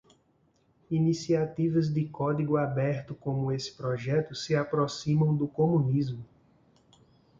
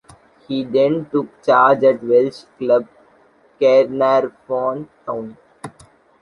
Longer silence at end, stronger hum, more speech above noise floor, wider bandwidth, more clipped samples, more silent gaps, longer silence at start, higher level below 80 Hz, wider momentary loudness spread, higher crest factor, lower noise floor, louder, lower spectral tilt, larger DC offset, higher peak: first, 1.15 s vs 0.5 s; neither; about the same, 40 dB vs 37 dB; second, 7.6 kHz vs 11 kHz; neither; neither; first, 0.9 s vs 0.5 s; about the same, -62 dBFS vs -62 dBFS; second, 7 LU vs 16 LU; about the same, 16 dB vs 16 dB; first, -68 dBFS vs -53 dBFS; second, -29 LUFS vs -17 LUFS; about the same, -7.5 dB/octave vs -7 dB/octave; neither; second, -14 dBFS vs -2 dBFS